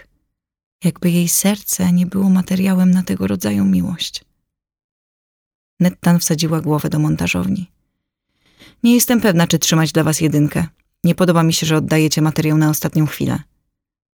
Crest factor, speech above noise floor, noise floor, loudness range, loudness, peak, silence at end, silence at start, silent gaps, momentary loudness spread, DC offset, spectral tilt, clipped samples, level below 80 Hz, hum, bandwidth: 16 dB; 58 dB; -73 dBFS; 5 LU; -16 LUFS; -2 dBFS; 0.8 s; 0.8 s; 4.84-5.77 s; 8 LU; under 0.1%; -5 dB/octave; under 0.1%; -48 dBFS; none; over 20 kHz